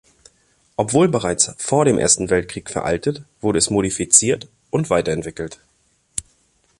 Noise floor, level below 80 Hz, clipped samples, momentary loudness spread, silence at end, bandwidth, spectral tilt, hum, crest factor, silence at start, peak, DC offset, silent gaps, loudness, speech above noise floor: -62 dBFS; -46 dBFS; under 0.1%; 16 LU; 0.6 s; 12.5 kHz; -3.5 dB/octave; none; 20 dB; 0.8 s; 0 dBFS; under 0.1%; none; -18 LUFS; 44 dB